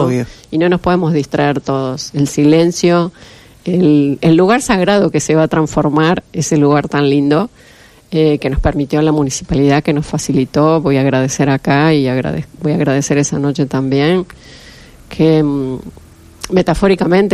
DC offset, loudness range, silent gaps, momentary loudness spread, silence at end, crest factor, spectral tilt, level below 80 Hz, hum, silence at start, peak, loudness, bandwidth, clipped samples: under 0.1%; 3 LU; none; 7 LU; 0 s; 12 dB; -6 dB/octave; -34 dBFS; none; 0 s; 0 dBFS; -13 LUFS; 13 kHz; under 0.1%